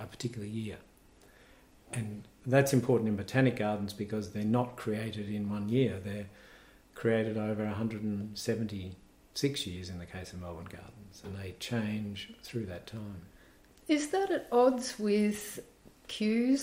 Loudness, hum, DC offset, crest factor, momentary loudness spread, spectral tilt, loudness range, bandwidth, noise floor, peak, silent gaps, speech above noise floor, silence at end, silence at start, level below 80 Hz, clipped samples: -33 LUFS; none; under 0.1%; 22 dB; 16 LU; -6 dB/octave; 9 LU; 16 kHz; -60 dBFS; -10 dBFS; none; 28 dB; 0 s; 0 s; -64 dBFS; under 0.1%